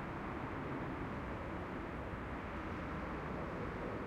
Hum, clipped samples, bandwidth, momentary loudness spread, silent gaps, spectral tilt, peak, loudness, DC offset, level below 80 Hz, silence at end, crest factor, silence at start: none; under 0.1%; 15.5 kHz; 2 LU; none; -7.5 dB/octave; -30 dBFS; -43 LUFS; under 0.1%; -52 dBFS; 0 s; 14 dB; 0 s